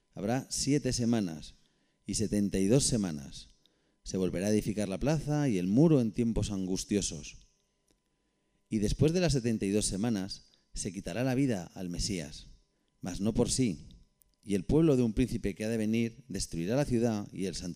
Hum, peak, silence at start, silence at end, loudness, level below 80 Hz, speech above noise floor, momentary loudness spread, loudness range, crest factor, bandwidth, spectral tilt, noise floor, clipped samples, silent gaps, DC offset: none; -14 dBFS; 0.15 s; 0 s; -31 LUFS; -48 dBFS; 46 dB; 15 LU; 4 LU; 18 dB; 15.5 kHz; -5.5 dB/octave; -77 dBFS; under 0.1%; none; under 0.1%